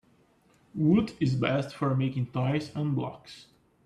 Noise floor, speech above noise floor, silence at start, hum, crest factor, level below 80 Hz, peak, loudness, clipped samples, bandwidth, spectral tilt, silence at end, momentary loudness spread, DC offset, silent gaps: -64 dBFS; 36 dB; 0.75 s; none; 18 dB; -62 dBFS; -12 dBFS; -28 LUFS; under 0.1%; 10 kHz; -8 dB/octave; 0.45 s; 18 LU; under 0.1%; none